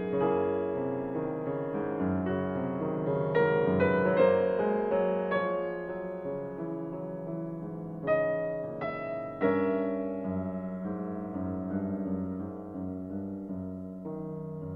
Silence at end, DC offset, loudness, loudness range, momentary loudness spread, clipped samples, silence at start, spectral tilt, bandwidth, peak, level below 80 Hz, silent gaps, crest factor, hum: 0 s; under 0.1%; -31 LUFS; 8 LU; 12 LU; under 0.1%; 0 s; -10.5 dB/octave; 4.8 kHz; -12 dBFS; -62 dBFS; none; 18 dB; none